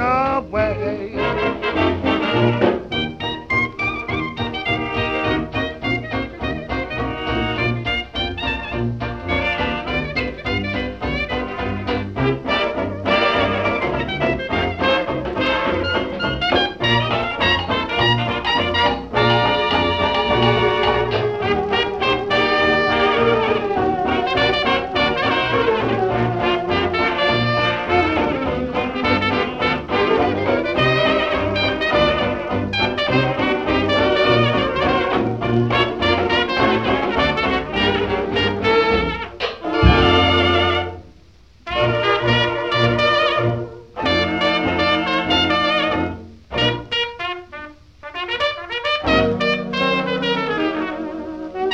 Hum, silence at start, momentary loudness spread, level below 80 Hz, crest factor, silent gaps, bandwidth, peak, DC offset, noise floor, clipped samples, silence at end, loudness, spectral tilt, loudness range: none; 0 s; 8 LU; -36 dBFS; 18 dB; none; 8.4 kHz; 0 dBFS; 0.2%; -48 dBFS; under 0.1%; 0 s; -19 LUFS; -6 dB/octave; 5 LU